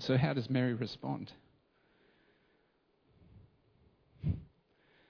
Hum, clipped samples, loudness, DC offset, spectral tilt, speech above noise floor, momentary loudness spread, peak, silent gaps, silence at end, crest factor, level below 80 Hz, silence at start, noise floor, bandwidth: none; under 0.1%; -36 LUFS; under 0.1%; -6.5 dB/octave; 40 dB; 11 LU; -16 dBFS; none; 0.65 s; 22 dB; -60 dBFS; 0 s; -74 dBFS; 5.4 kHz